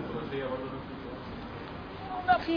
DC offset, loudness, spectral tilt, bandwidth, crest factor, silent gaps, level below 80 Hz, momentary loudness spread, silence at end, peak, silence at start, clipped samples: under 0.1%; -35 LUFS; -4 dB/octave; 5.2 kHz; 22 dB; none; -52 dBFS; 13 LU; 0 s; -12 dBFS; 0 s; under 0.1%